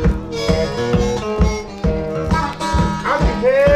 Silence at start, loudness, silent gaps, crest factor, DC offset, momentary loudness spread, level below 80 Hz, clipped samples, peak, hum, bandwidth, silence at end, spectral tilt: 0 s; -18 LUFS; none; 16 dB; 0.2%; 6 LU; -24 dBFS; under 0.1%; 0 dBFS; none; 12.5 kHz; 0 s; -6.5 dB/octave